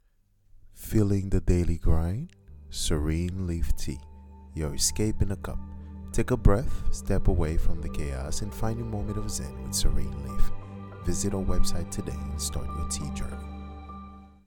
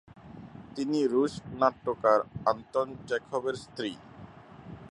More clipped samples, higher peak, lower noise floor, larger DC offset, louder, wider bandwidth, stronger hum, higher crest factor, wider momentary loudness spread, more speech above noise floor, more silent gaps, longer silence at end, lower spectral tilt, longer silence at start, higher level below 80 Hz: neither; first, -4 dBFS vs -8 dBFS; first, -64 dBFS vs -49 dBFS; neither; about the same, -30 LUFS vs -30 LUFS; first, 17.5 kHz vs 11 kHz; neither; about the same, 22 dB vs 22 dB; second, 16 LU vs 23 LU; first, 39 dB vs 20 dB; neither; first, 0.2 s vs 0.05 s; about the same, -5 dB/octave vs -6 dB/octave; first, 0.55 s vs 0.15 s; first, -30 dBFS vs -62 dBFS